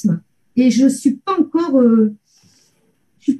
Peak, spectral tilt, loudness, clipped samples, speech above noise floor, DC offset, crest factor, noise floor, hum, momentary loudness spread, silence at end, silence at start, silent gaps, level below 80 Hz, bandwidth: -4 dBFS; -6.5 dB/octave; -16 LUFS; under 0.1%; 48 dB; under 0.1%; 14 dB; -61 dBFS; none; 10 LU; 0 s; 0.05 s; none; -64 dBFS; 12.5 kHz